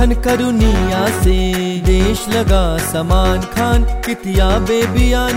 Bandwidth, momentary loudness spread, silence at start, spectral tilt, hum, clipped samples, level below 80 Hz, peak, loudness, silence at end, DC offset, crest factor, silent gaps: 16 kHz; 3 LU; 0 s; -5.5 dB/octave; none; under 0.1%; -16 dBFS; -2 dBFS; -15 LUFS; 0 s; 0.2%; 10 dB; none